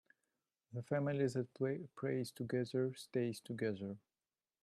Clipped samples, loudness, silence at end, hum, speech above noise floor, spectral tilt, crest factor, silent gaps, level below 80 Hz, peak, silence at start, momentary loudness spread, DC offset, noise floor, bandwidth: under 0.1%; -41 LUFS; 0.65 s; none; over 50 dB; -7 dB/octave; 16 dB; none; -82 dBFS; -24 dBFS; 0.7 s; 10 LU; under 0.1%; under -90 dBFS; 13 kHz